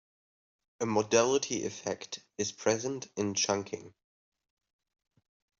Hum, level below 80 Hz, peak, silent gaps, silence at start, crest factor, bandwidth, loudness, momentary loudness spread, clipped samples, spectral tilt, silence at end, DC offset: none; -74 dBFS; -10 dBFS; none; 0.8 s; 24 dB; 7.8 kHz; -31 LUFS; 13 LU; under 0.1%; -3 dB/octave; 1.7 s; under 0.1%